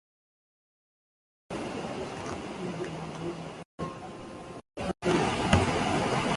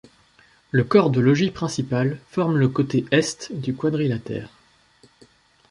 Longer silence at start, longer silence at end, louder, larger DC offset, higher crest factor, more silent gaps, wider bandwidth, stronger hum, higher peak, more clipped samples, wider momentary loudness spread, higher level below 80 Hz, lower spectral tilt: first, 1.5 s vs 0.75 s; second, 0 s vs 1.25 s; second, -31 LUFS vs -22 LUFS; neither; first, 26 dB vs 20 dB; first, 3.65-3.78 s vs none; about the same, 11.5 kHz vs 11.5 kHz; neither; second, -6 dBFS vs -2 dBFS; neither; first, 17 LU vs 11 LU; first, -46 dBFS vs -56 dBFS; second, -5 dB/octave vs -6.5 dB/octave